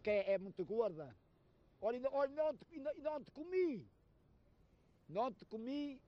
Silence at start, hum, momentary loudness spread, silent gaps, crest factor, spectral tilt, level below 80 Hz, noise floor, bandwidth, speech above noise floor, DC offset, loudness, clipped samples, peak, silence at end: 0.05 s; none; 10 LU; none; 16 dB; -7.5 dB/octave; -74 dBFS; -71 dBFS; 6.4 kHz; 30 dB; under 0.1%; -42 LUFS; under 0.1%; -26 dBFS; 0.1 s